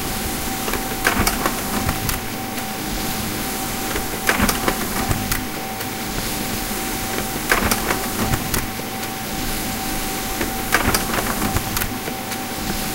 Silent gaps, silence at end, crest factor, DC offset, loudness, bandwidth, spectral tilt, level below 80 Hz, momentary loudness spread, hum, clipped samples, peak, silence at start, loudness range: none; 0 s; 22 dB; under 0.1%; -22 LUFS; 17 kHz; -3 dB/octave; -32 dBFS; 7 LU; none; under 0.1%; 0 dBFS; 0 s; 1 LU